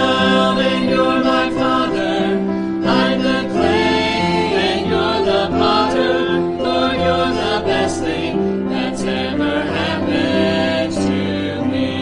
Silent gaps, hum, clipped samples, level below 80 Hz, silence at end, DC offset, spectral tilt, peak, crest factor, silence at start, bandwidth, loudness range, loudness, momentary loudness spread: none; none; under 0.1%; -44 dBFS; 0 s; under 0.1%; -5.5 dB/octave; -2 dBFS; 14 dB; 0 s; 11 kHz; 2 LU; -17 LUFS; 5 LU